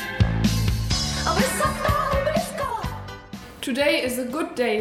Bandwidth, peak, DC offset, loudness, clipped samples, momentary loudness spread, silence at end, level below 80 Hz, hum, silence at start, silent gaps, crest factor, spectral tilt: 16.5 kHz; -6 dBFS; under 0.1%; -23 LUFS; under 0.1%; 12 LU; 0 s; -34 dBFS; none; 0 s; none; 18 dB; -4.5 dB/octave